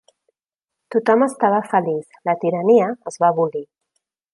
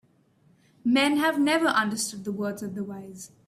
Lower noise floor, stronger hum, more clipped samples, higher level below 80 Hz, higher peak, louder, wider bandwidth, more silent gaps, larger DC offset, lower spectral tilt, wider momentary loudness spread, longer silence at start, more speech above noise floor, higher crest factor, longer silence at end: first, -85 dBFS vs -62 dBFS; neither; neither; about the same, -74 dBFS vs -70 dBFS; first, -2 dBFS vs -10 dBFS; first, -19 LUFS vs -25 LUFS; second, 11.5 kHz vs 14.5 kHz; neither; neither; first, -7 dB/octave vs -3.5 dB/octave; second, 9 LU vs 14 LU; about the same, 0.9 s vs 0.85 s; first, 67 dB vs 37 dB; about the same, 18 dB vs 18 dB; first, 0.7 s vs 0.2 s